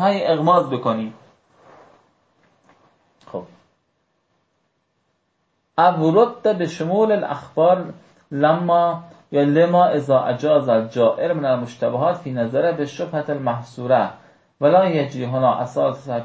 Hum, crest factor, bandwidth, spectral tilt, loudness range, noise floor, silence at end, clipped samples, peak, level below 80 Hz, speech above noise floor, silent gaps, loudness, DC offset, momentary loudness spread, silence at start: none; 16 dB; 8 kHz; -7.5 dB/octave; 6 LU; -69 dBFS; 0 s; under 0.1%; -2 dBFS; -66 dBFS; 51 dB; none; -19 LUFS; under 0.1%; 10 LU; 0 s